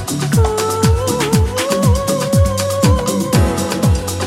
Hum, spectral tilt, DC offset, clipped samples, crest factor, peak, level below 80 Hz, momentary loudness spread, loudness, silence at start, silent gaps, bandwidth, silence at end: none; -5.5 dB/octave; under 0.1%; under 0.1%; 14 dB; 0 dBFS; -24 dBFS; 2 LU; -15 LUFS; 0 s; none; 16.5 kHz; 0 s